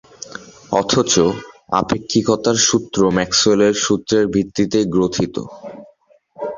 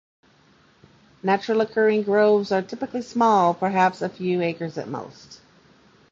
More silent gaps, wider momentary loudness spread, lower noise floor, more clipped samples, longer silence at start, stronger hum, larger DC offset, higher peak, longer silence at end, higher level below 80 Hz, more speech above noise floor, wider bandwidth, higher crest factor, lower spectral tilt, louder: neither; first, 19 LU vs 12 LU; second, -53 dBFS vs -57 dBFS; neither; second, 0.25 s vs 1.25 s; neither; neither; first, 0 dBFS vs -6 dBFS; second, 0 s vs 0.75 s; first, -46 dBFS vs -66 dBFS; about the same, 36 dB vs 36 dB; about the same, 7.6 kHz vs 7.6 kHz; about the same, 18 dB vs 18 dB; second, -4 dB/octave vs -6.5 dB/octave; first, -16 LUFS vs -22 LUFS